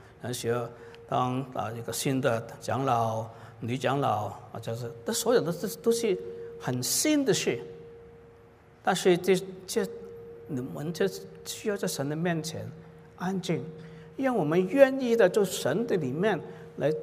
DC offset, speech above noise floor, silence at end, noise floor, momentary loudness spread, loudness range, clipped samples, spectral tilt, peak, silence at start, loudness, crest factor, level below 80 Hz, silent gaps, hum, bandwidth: under 0.1%; 27 dB; 0 s; -55 dBFS; 17 LU; 6 LU; under 0.1%; -4.5 dB/octave; -6 dBFS; 0 s; -28 LUFS; 24 dB; -66 dBFS; none; none; 16 kHz